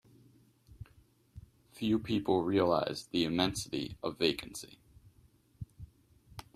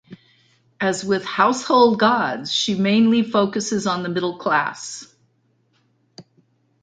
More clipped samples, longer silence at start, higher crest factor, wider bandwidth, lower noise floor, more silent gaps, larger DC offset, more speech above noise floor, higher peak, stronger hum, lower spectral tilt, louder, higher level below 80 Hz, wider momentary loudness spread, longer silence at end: neither; first, 0.7 s vs 0.1 s; about the same, 22 dB vs 20 dB; first, 15 kHz vs 9.4 kHz; about the same, -65 dBFS vs -64 dBFS; neither; neither; second, 33 dB vs 45 dB; second, -12 dBFS vs -2 dBFS; neither; about the same, -5 dB/octave vs -4.5 dB/octave; second, -33 LUFS vs -19 LUFS; about the same, -60 dBFS vs -64 dBFS; first, 25 LU vs 9 LU; second, 0.15 s vs 0.6 s